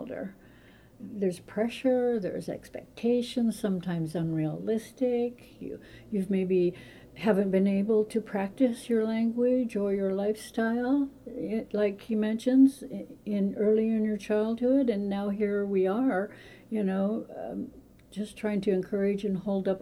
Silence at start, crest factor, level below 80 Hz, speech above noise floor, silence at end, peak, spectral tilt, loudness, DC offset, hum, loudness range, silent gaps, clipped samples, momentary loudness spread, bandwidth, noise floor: 0 s; 16 dB; -62 dBFS; 27 dB; 0 s; -12 dBFS; -7.5 dB/octave; -29 LUFS; under 0.1%; none; 4 LU; none; under 0.1%; 14 LU; 13.5 kHz; -55 dBFS